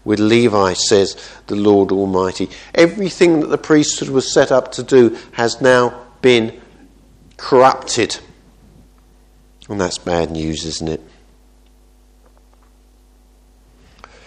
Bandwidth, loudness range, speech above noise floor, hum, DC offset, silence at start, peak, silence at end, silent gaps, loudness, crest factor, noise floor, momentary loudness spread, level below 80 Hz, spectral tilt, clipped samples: 10 kHz; 10 LU; 34 dB; none; under 0.1%; 0.05 s; 0 dBFS; 3.25 s; none; -15 LUFS; 16 dB; -49 dBFS; 11 LU; -46 dBFS; -4.5 dB/octave; under 0.1%